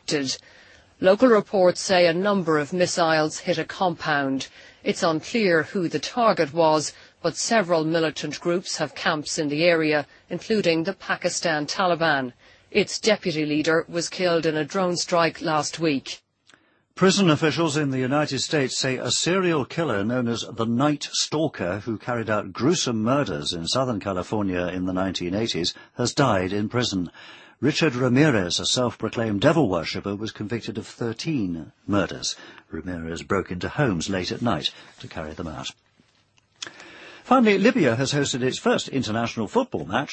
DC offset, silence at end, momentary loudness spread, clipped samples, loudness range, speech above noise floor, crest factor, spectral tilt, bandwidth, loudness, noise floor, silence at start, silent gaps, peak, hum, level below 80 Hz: under 0.1%; 0 s; 12 LU; under 0.1%; 5 LU; 40 dB; 20 dB; -4.5 dB/octave; 8.8 kHz; -23 LUFS; -63 dBFS; 0.1 s; none; -4 dBFS; none; -56 dBFS